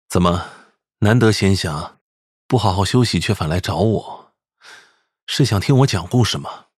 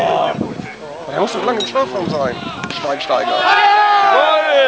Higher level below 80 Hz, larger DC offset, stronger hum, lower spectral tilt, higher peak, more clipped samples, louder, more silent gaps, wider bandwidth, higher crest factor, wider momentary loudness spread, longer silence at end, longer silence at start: first, -42 dBFS vs -52 dBFS; second, under 0.1% vs 0.1%; neither; first, -5.5 dB/octave vs -4 dB/octave; about the same, 0 dBFS vs 0 dBFS; neither; second, -18 LUFS vs -15 LUFS; first, 2.01-2.49 s, 5.22-5.27 s vs none; first, 14.5 kHz vs 8 kHz; about the same, 18 dB vs 14 dB; second, 11 LU vs 14 LU; first, 0.2 s vs 0 s; about the same, 0.1 s vs 0 s